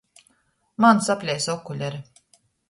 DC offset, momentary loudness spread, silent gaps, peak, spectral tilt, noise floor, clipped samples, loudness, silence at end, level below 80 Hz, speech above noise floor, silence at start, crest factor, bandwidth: under 0.1%; 18 LU; none; -4 dBFS; -4.5 dB/octave; -67 dBFS; under 0.1%; -22 LUFS; 0.7 s; -66 dBFS; 46 dB; 0.8 s; 20 dB; 11.5 kHz